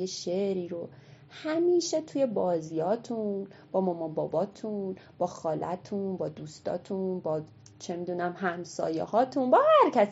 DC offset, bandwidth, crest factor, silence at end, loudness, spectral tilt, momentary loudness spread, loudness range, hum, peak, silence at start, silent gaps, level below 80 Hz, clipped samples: under 0.1%; 8 kHz; 18 dB; 0 s; -29 LUFS; -5 dB/octave; 14 LU; 5 LU; none; -10 dBFS; 0 s; none; -76 dBFS; under 0.1%